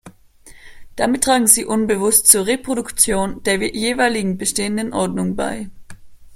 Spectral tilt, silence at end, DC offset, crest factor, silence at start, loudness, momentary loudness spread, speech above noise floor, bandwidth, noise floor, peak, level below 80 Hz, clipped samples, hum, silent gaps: -2.5 dB/octave; 0 s; under 0.1%; 18 dB; 0.05 s; -16 LUFS; 11 LU; 27 dB; 16.5 kHz; -44 dBFS; 0 dBFS; -44 dBFS; under 0.1%; none; none